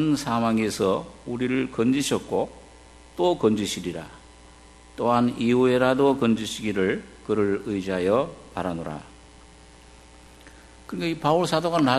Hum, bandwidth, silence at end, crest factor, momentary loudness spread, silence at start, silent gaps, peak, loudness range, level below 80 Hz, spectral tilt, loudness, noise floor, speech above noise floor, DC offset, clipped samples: none; 13 kHz; 0 s; 20 dB; 13 LU; 0 s; none; -6 dBFS; 7 LU; -52 dBFS; -5.5 dB/octave; -24 LUFS; -49 dBFS; 26 dB; under 0.1%; under 0.1%